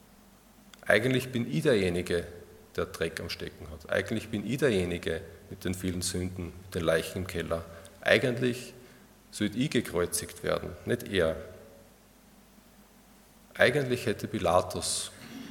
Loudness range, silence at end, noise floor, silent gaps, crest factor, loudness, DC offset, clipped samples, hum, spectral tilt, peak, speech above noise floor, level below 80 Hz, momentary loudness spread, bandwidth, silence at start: 3 LU; 0 s; -57 dBFS; none; 26 dB; -30 LUFS; under 0.1%; under 0.1%; none; -4.5 dB/octave; -6 dBFS; 28 dB; -58 dBFS; 16 LU; 18 kHz; 0.85 s